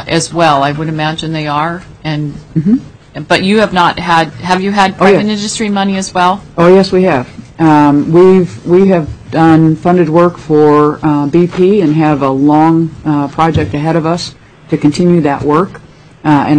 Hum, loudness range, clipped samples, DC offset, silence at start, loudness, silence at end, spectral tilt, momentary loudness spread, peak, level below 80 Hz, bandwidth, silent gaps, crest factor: none; 4 LU; under 0.1%; under 0.1%; 0 s; -10 LUFS; 0 s; -6.5 dB/octave; 10 LU; 0 dBFS; -38 dBFS; 10.5 kHz; none; 10 dB